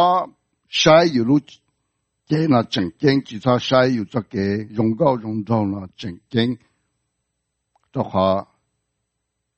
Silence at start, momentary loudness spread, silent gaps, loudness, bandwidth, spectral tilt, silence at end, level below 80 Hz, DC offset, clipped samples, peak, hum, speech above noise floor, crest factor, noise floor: 0 s; 12 LU; none; -19 LUFS; 8.4 kHz; -6 dB/octave; 1.15 s; -58 dBFS; under 0.1%; under 0.1%; 0 dBFS; none; 59 dB; 20 dB; -77 dBFS